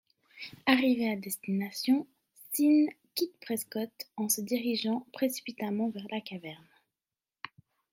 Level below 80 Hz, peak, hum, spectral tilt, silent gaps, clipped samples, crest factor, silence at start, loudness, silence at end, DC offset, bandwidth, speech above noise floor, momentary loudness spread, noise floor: -80 dBFS; -8 dBFS; none; -3.5 dB/octave; none; under 0.1%; 24 dB; 0.35 s; -31 LUFS; 1.35 s; under 0.1%; 16.5 kHz; over 60 dB; 20 LU; under -90 dBFS